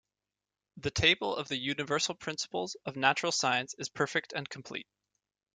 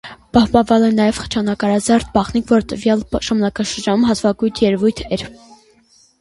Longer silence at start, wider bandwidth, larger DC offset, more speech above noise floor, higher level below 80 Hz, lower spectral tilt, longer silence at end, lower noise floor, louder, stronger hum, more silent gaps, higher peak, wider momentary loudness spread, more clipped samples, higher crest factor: first, 0.75 s vs 0.05 s; second, 10 kHz vs 11.5 kHz; neither; first, over 57 dB vs 37 dB; second, -62 dBFS vs -40 dBFS; second, -2.5 dB/octave vs -5.5 dB/octave; second, 0.75 s vs 0.9 s; first, under -90 dBFS vs -53 dBFS; second, -31 LUFS vs -16 LUFS; neither; neither; second, -10 dBFS vs 0 dBFS; first, 13 LU vs 7 LU; neither; first, 24 dB vs 16 dB